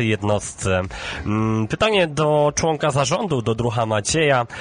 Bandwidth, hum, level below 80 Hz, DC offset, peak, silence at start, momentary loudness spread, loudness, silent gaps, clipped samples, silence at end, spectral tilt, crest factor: 10 kHz; none; -42 dBFS; under 0.1%; -6 dBFS; 0 s; 5 LU; -20 LUFS; none; under 0.1%; 0 s; -4.5 dB/octave; 14 dB